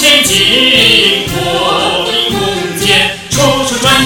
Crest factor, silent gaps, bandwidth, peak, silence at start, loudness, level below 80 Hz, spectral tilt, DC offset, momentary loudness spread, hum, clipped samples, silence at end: 10 dB; none; over 20 kHz; 0 dBFS; 0 s; -8 LUFS; -34 dBFS; -2.5 dB/octave; under 0.1%; 8 LU; none; 1%; 0 s